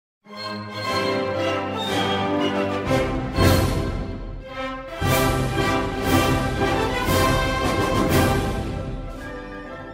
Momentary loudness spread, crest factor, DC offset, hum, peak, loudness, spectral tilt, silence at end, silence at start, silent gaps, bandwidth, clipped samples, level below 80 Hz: 14 LU; 18 dB; under 0.1%; none; -4 dBFS; -22 LUFS; -5 dB/octave; 0 s; 0.25 s; none; 16.5 kHz; under 0.1%; -34 dBFS